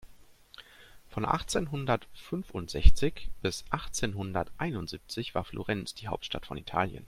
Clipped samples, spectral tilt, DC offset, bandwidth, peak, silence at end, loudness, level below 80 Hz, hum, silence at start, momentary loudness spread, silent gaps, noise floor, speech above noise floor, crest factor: under 0.1%; -5 dB/octave; under 0.1%; 13.5 kHz; -2 dBFS; 0 s; -33 LUFS; -34 dBFS; none; 0.05 s; 11 LU; none; -54 dBFS; 26 dB; 26 dB